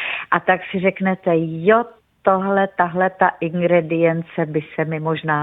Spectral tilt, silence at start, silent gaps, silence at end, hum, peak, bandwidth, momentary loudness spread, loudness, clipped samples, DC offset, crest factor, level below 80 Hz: -10 dB/octave; 0 s; none; 0 s; none; 0 dBFS; 4 kHz; 7 LU; -19 LUFS; under 0.1%; under 0.1%; 18 dB; -60 dBFS